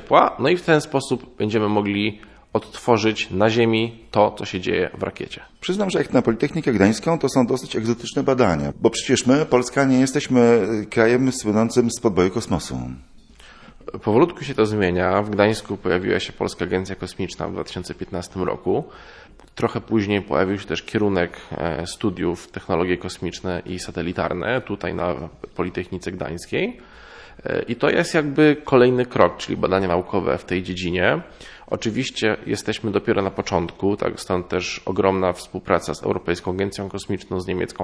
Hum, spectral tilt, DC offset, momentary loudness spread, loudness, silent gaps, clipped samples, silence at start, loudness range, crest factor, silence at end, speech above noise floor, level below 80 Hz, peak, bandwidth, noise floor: none; -5.5 dB/octave; under 0.1%; 11 LU; -21 LUFS; none; under 0.1%; 0 s; 7 LU; 22 dB; 0 s; 25 dB; -48 dBFS; 0 dBFS; 11 kHz; -46 dBFS